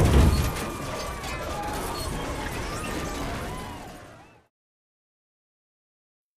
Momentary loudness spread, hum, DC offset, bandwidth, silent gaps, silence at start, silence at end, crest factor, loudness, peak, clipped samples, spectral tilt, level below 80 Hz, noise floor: 16 LU; none; under 0.1%; 15.5 kHz; none; 0 s; 2.1 s; 22 dB; -29 LUFS; -6 dBFS; under 0.1%; -5.5 dB/octave; -32 dBFS; -49 dBFS